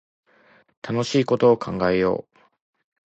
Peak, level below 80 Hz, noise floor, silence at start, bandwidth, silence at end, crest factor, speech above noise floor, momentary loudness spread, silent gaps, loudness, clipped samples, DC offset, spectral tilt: -4 dBFS; -54 dBFS; -57 dBFS; 0.85 s; 8.2 kHz; 0.85 s; 18 dB; 37 dB; 11 LU; none; -21 LUFS; under 0.1%; under 0.1%; -6 dB/octave